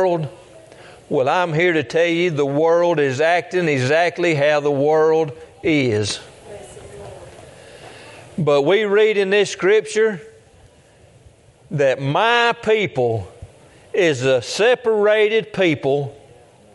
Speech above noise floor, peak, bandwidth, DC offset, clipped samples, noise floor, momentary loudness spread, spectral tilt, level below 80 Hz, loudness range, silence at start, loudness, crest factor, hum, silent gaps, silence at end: 33 dB; -2 dBFS; 11.5 kHz; under 0.1%; under 0.1%; -50 dBFS; 17 LU; -5 dB/octave; -58 dBFS; 4 LU; 0 s; -18 LUFS; 16 dB; none; none; 0.6 s